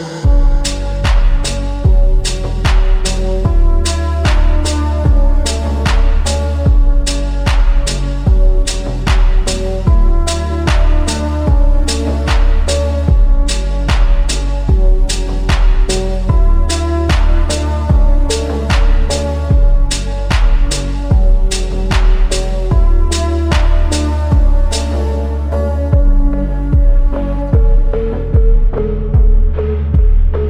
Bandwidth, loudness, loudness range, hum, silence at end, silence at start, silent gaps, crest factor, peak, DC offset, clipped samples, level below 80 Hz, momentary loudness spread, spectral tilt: 10.5 kHz; -15 LUFS; 1 LU; none; 0 s; 0 s; none; 10 dB; 0 dBFS; under 0.1%; under 0.1%; -10 dBFS; 4 LU; -5.5 dB/octave